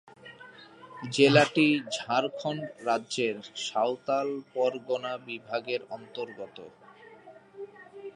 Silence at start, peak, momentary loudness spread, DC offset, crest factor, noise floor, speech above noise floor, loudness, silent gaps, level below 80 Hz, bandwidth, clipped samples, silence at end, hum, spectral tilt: 0.05 s; -6 dBFS; 24 LU; under 0.1%; 24 dB; -52 dBFS; 23 dB; -28 LUFS; none; -78 dBFS; 11.5 kHz; under 0.1%; 0.05 s; none; -4.5 dB/octave